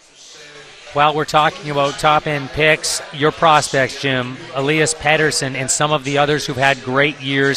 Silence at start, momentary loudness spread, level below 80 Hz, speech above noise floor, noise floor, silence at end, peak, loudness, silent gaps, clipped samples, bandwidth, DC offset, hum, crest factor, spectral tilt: 0.2 s; 5 LU; -46 dBFS; 24 dB; -41 dBFS; 0 s; 0 dBFS; -16 LUFS; none; under 0.1%; 15 kHz; under 0.1%; none; 18 dB; -3.5 dB/octave